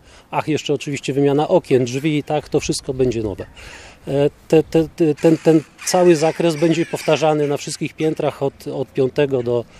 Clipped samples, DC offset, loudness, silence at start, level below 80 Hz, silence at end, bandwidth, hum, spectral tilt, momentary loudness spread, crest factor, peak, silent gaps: under 0.1%; under 0.1%; -18 LUFS; 0.3 s; -48 dBFS; 0.15 s; 15 kHz; none; -5.5 dB/octave; 9 LU; 18 dB; 0 dBFS; none